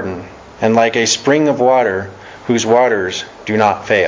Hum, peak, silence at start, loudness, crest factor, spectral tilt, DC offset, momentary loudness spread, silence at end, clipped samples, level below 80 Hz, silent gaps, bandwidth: none; 0 dBFS; 0 s; -14 LUFS; 14 dB; -4 dB/octave; under 0.1%; 12 LU; 0 s; under 0.1%; -48 dBFS; none; 7.6 kHz